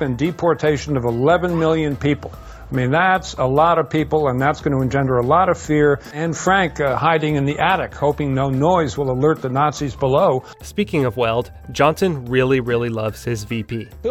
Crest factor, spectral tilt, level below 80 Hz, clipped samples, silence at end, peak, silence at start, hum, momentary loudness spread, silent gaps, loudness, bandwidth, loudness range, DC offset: 16 dB; -6.5 dB/octave; -40 dBFS; under 0.1%; 0 s; -2 dBFS; 0 s; none; 8 LU; none; -18 LUFS; 15.5 kHz; 2 LU; under 0.1%